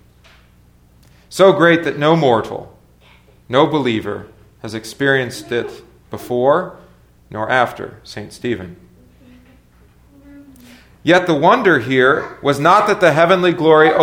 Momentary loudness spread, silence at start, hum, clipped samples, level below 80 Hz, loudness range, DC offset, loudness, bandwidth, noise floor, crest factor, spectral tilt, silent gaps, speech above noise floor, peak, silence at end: 19 LU; 1.3 s; 60 Hz at -50 dBFS; under 0.1%; -52 dBFS; 10 LU; under 0.1%; -14 LUFS; 17.5 kHz; -49 dBFS; 16 dB; -5.5 dB/octave; none; 35 dB; 0 dBFS; 0 s